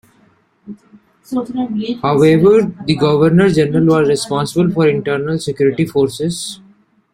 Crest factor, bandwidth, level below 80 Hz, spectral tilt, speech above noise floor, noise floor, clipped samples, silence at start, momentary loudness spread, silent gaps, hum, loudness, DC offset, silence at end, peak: 14 dB; 14.5 kHz; -48 dBFS; -6.5 dB/octave; 40 dB; -54 dBFS; under 0.1%; 0.65 s; 10 LU; none; none; -14 LUFS; under 0.1%; 0.6 s; 0 dBFS